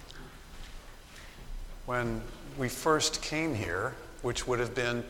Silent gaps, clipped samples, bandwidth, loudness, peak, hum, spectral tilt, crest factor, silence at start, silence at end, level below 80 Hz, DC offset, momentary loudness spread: none; under 0.1%; 18.5 kHz; -32 LUFS; -12 dBFS; none; -4 dB/octave; 22 dB; 0 s; 0 s; -46 dBFS; under 0.1%; 21 LU